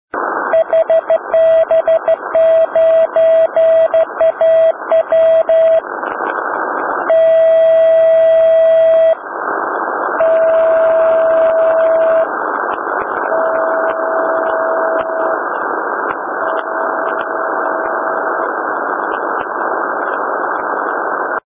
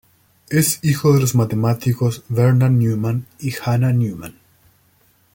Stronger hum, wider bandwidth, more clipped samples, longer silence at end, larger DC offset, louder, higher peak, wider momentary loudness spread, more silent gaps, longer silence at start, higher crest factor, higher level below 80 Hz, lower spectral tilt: neither; second, 3.7 kHz vs 17 kHz; neither; second, 0.1 s vs 1.05 s; neither; first, -13 LUFS vs -18 LUFS; about the same, -4 dBFS vs -4 dBFS; about the same, 8 LU vs 10 LU; neither; second, 0.15 s vs 0.5 s; second, 8 dB vs 14 dB; about the same, -56 dBFS vs -52 dBFS; first, -7.5 dB/octave vs -6 dB/octave